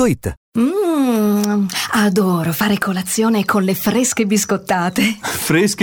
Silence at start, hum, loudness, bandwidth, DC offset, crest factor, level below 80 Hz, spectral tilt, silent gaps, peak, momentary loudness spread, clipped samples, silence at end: 0 s; none; -16 LUFS; over 20 kHz; under 0.1%; 14 dB; -46 dBFS; -4.5 dB/octave; 0.37-0.52 s; -2 dBFS; 3 LU; under 0.1%; 0 s